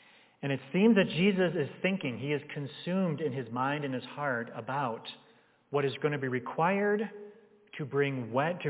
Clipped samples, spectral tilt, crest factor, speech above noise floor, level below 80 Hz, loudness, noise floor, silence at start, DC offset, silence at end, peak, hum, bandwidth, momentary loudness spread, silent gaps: under 0.1%; -5 dB/octave; 20 dB; 24 dB; -82 dBFS; -31 LUFS; -54 dBFS; 0.4 s; under 0.1%; 0 s; -12 dBFS; none; 4 kHz; 13 LU; none